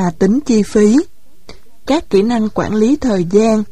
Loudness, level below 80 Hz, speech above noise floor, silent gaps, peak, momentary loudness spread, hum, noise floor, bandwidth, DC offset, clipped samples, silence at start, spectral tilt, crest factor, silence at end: -13 LUFS; -40 dBFS; 29 dB; none; 0 dBFS; 7 LU; none; -41 dBFS; 11.5 kHz; 3%; under 0.1%; 0 s; -6.5 dB/octave; 12 dB; 0.05 s